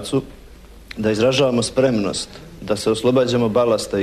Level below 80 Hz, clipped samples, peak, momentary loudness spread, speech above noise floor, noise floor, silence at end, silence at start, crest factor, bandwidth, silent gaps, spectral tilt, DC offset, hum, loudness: -44 dBFS; under 0.1%; -6 dBFS; 14 LU; 23 dB; -42 dBFS; 0 s; 0 s; 14 dB; 13.5 kHz; none; -5 dB/octave; under 0.1%; none; -19 LUFS